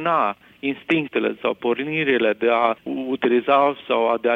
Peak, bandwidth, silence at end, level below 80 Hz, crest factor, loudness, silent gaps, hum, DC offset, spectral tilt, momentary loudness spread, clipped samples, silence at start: -4 dBFS; 5.4 kHz; 0 s; -66 dBFS; 16 dB; -21 LUFS; none; none; under 0.1%; -7.5 dB/octave; 9 LU; under 0.1%; 0 s